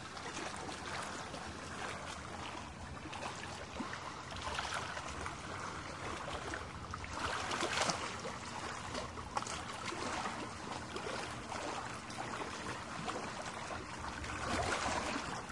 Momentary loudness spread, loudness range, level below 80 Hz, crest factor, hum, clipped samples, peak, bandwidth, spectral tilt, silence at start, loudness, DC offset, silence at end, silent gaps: 8 LU; 4 LU; -58 dBFS; 26 dB; none; under 0.1%; -16 dBFS; 11.5 kHz; -3 dB/octave; 0 s; -41 LUFS; under 0.1%; 0 s; none